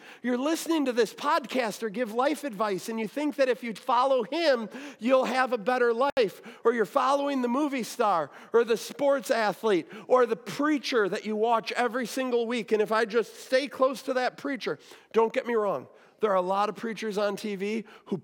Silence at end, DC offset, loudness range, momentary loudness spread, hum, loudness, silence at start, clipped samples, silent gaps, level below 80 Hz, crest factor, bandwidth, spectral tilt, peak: 0 s; under 0.1%; 3 LU; 7 LU; none; -27 LUFS; 0 s; under 0.1%; 6.12-6.17 s; -82 dBFS; 18 dB; 18 kHz; -4 dB/octave; -10 dBFS